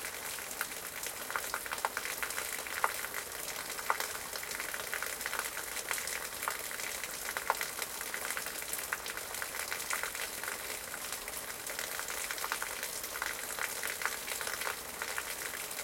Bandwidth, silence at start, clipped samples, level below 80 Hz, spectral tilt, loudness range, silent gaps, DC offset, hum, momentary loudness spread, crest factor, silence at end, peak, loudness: 17 kHz; 0 s; under 0.1%; -64 dBFS; 0.5 dB/octave; 1 LU; none; under 0.1%; none; 4 LU; 30 dB; 0 s; -10 dBFS; -36 LUFS